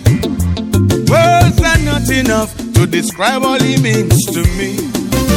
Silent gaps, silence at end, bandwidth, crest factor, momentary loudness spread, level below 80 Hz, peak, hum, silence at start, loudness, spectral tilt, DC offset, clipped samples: none; 0 s; 17.5 kHz; 12 dB; 7 LU; -24 dBFS; 0 dBFS; none; 0 s; -12 LUFS; -5 dB/octave; under 0.1%; under 0.1%